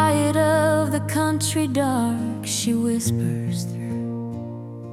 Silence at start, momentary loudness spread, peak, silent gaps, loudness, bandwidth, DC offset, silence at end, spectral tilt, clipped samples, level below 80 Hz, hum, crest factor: 0 s; 11 LU; -8 dBFS; none; -22 LUFS; 16 kHz; under 0.1%; 0 s; -5 dB/octave; under 0.1%; -58 dBFS; none; 14 dB